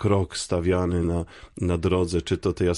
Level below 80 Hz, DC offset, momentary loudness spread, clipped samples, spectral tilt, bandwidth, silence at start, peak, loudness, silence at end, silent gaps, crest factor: -36 dBFS; under 0.1%; 6 LU; under 0.1%; -6 dB/octave; 11.5 kHz; 0 s; -10 dBFS; -25 LUFS; 0 s; none; 14 dB